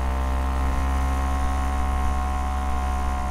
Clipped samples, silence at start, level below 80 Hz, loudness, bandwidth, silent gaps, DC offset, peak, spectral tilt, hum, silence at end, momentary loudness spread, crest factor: under 0.1%; 0 s; -24 dBFS; -26 LUFS; 13 kHz; none; under 0.1%; -12 dBFS; -6 dB/octave; none; 0 s; 2 LU; 10 dB